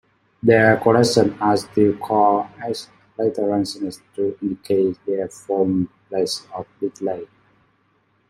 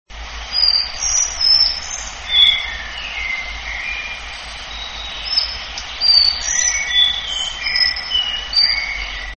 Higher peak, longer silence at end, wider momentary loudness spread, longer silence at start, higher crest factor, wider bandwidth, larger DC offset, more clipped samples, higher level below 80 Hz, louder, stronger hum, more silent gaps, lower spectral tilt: about the same, -2 dBFS vs 0 dBFS; first, 1.05 s vs 0 s; about the same, 14 LU vs 15 LU; first, 0.45 s vs 0.1 s; about the same, 20 dB vs 18 dB; first, 16 kHz vs 8.8 kHz; second, under 0.1% vs 0.3%; neither; second, -58 dBFS vs -36 dBFS; second, -20 LUFS vs -15 LUFS; neither; neither; first, -5.5 dB/octave vs 1.5 dB/octave